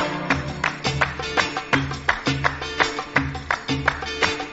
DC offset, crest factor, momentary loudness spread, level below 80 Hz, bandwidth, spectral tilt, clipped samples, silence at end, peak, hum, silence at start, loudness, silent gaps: under 0.1%; 22 dB; 3 LU; -40 dBFS; 8 kHz; -2.5 dB/octave; under 0.1%; 0 s; -2 dBFS; none; 0 s; -23 LUFS; none